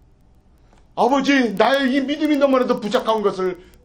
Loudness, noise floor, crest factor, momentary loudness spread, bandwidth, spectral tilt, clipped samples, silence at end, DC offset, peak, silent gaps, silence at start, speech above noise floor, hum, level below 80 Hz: -18 LUFS; -52 dBFS; 18 dB; 6 LU; 16.5 kHz; -5 dB/octave; under 0.1%; 0.25 s; under 0.1%; -2 dBFS; none; 0.95 s; 34 dB; none; -54 dBFS